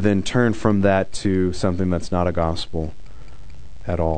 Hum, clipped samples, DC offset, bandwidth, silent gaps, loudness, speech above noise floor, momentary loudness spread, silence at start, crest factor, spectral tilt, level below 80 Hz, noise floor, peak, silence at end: none; under 0.1%; 4%; 9.4 kHz; none; -21 LUFS; 21 dB; 10 LU; 0 s; 18 dB; -6.5 dB/octave; -40 dBFS; -41 dBFS; -2 dBFS; 0 s